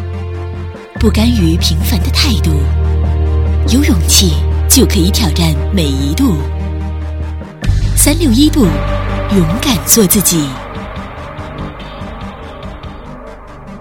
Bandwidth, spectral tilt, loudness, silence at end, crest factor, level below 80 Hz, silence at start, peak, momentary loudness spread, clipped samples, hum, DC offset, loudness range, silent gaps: over 20 kHz; -4.5 dB/octave; -12 LUFS; 0 s; 12 dB; -18 dBFS; 0 s; 0 dBFS; 18 LU; under 0.1%; none; under 0.1%; 4 LU; none